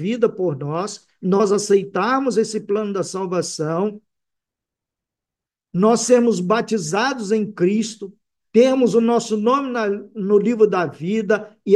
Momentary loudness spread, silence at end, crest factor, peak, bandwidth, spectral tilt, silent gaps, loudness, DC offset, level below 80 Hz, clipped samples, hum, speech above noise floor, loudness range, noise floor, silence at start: 9 LU; 0 s; 16 dB; -2 dBFS; 12 kHz; -5.5 dB/octave; none; -19 LUFS; under 0.1%; -70 dBFS; under 0.1%; none; 69 dB; 5 LU; -88 dBFS; 0 s